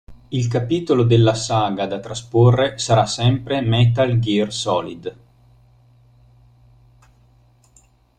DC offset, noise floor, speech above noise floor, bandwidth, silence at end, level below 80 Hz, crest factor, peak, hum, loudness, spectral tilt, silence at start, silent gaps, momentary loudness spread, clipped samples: under 0.1%; -55 dBFS; 37 dB; 9.4 kHz; 3.05 s; -48 dBFS; 18 dB; -2 dBFS; none; -18 LUFS; -6 dB/octave; 0.1 s; none; 10 LU; under 0.1%